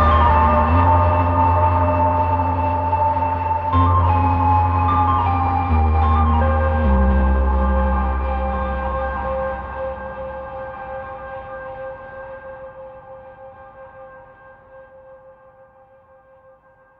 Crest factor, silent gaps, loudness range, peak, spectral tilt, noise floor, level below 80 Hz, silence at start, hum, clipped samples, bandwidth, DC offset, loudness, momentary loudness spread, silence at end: 16 dB; none; 18 LU; -4 dBFS; -10.5 dB/octave; -51 dBFS; -24 dBFS; 0 s; none; under 0.1%; 4.5 kHz; under 0.1%; -18 LUFS; 19 LU; 1.85 s